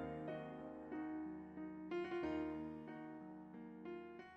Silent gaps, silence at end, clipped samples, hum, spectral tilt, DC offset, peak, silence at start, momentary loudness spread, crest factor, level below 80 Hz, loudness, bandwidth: none; 0 s; under 0.1%; none; -8 dB/octave; under 0.1%; -34 dBFS; 0 s; 10 LU; 14 dB; -72 dBFS; -49 LUFS; 6.6 kHz